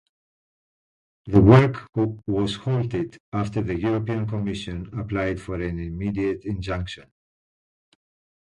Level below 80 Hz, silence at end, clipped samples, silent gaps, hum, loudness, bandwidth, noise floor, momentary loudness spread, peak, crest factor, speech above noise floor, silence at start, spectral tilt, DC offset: -42 dBFS; 1.4 s; under 0.1%; 3.20-3.32 s; none; -23 LUFS; 10.5 kHz; under -90 dBFS; 14 LU; 0 dBFS; 24 dB; over 68 dB; 1.25 s; -8 dB/octave; under 0.1%